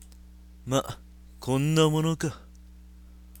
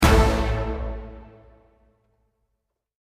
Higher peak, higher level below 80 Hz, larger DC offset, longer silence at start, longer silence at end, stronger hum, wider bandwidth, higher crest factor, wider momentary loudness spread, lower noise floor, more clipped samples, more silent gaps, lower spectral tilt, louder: second, -10 dBFS vs -4 dBFS; second, -50 dBFS vs -28 dBFS; neither; about the same, 0 s vs 0 s; second, 0 s vs 1.9 s; neither; first, 17.5 kHz vs 15.5 kHz; about the same, 18 dB vs 22 dB; about the same, 22 LU vs 24 LU; second, -49 dBFS vs -78 dBFS; neither; neither; about the same, -5.5 dB/octave vs -5.5 dB/octave; second, -26 LUFS vs -23 LUFS